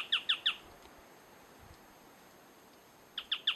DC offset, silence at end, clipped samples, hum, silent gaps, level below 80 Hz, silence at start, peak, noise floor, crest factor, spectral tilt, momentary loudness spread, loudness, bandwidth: under 0.1%; 0 s; under 0.1%; none; none; -72 dBFS; 0 s; -18 dBFS; -59 dBFS; 22 dB; -0.5 dB/octave; 27 LU; -34 LUFS; 13 kHz